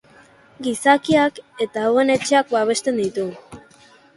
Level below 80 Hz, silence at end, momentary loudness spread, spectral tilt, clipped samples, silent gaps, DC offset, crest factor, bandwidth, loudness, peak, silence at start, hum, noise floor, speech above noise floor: -60 dBFS; 0.6 s; 11 LU; -4 dB/octave; under 0.1%; none; under 0.1%; 18 dB; 11.5 kHz; -19 LUFS; -2 dBFS; 0.6 s; none; -50 dBFS; 32 dB